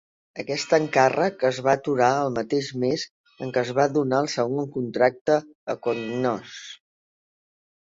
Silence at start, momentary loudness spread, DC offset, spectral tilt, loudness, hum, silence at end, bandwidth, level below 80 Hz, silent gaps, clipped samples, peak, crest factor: 0.35 s; 14 LU; under 0.1%; -5 dB/octave; -24 LUFS; none; 1.05 s; 7.8 kHz; -66 dBFS; 3.11-3.24 s, 5.21-5.25 s, 5.55-5.67 s; under 0.1%; -4 dBFS; 20 dB